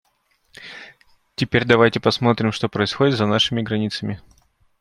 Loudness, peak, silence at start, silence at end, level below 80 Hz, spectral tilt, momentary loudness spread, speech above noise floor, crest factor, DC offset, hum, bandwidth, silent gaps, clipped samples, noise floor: -19 LUFS; -2 dBFS; 0.6 s; 0.65 s; -54 dBFS; -5.5 dB/octave; 21 LU; 46 dB; 20 dB; under 0.1%; none; 12 kHz; none; under 0.1%; -65 dBFS